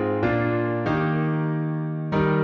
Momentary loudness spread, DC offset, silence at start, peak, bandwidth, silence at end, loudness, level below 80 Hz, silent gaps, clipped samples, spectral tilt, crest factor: 4 LU; under 0.1%; 0 s; -8 dBFS; 5.8 kHz; 0 s; -24 LUFS; -48 dBFS; none; under 0.1%; -9.5 dB/octave; 14 dB